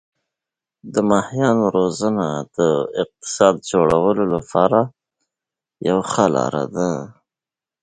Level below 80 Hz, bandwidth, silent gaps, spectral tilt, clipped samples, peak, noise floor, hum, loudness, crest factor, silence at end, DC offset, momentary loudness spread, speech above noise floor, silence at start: -52 dBFS; 9.4 kHz; none; -6 dB/octave; under 0.1%; 0 dBFS; -89 dBFS; none; -19 LUFS; 20 dB; 0.7 s; under 0.1%; 9 LU; 72 dB; 0.85 s